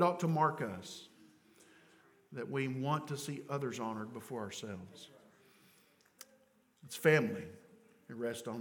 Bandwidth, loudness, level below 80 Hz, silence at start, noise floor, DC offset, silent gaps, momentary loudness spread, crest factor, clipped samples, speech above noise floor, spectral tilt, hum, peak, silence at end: 18 kHz; -37 LUFS; -82 dBFS; 0 s; -70 dBFS; under 0.1%; none; 23 LU; 26 dB; under 0.1%; 34 dB; -5.5 dB/octave; none; -14 dBFS; 0 s